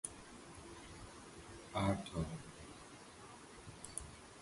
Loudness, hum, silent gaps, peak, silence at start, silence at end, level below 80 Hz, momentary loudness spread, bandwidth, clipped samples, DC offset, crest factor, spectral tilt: -47 LUFS; none; none; -22 dBFS; 0.05 s; 0 s; -60 dBFS; 17 LU; 11.5 kHz; under 0.1%; under 0.1%; 24 dB; -5 dB/octave